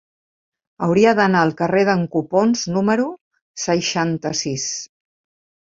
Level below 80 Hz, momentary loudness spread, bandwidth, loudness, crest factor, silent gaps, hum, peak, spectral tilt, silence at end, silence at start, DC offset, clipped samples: -58 dBFS; 11 LU; 7.8 kHz; -18 LUFS; 18 dB; 3.21-3.31 s, 3.41-3.54 s; none; -2 dBFS; -4.5 dB/octave; 0.8 s; 0.8 s; under 0.1%; under 0.1%